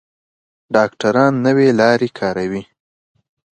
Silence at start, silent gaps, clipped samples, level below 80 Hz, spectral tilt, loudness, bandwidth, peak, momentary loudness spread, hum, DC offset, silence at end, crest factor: 0.7 s; none; under 0.1%; -58 dBFS; -6.5 dB/octave; -15 LUFS; 9.4 kHz; 0 dBFS; 10 LU; none; under 0.1%; 0.95 s; 16 dB